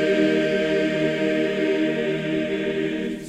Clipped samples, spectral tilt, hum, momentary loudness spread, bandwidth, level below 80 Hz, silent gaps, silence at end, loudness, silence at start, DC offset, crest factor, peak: under 0.1%; -6 dB/octave; none; 5 LU; 10 kHz; -54 dBFS; none; 0 s; -22 LUFS; 0 s; under 0.1%; 14 dB; -8 dBFS